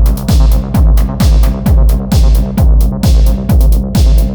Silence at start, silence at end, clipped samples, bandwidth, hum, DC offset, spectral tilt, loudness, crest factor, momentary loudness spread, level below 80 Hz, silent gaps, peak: 0 s; 0 s; under 0.1%; over 20 kHz; none; under 0.1%; -7 dB/octave; -11 LUFS; 8 dB; 1 LU; -8 dBFS; none; 0 dBFS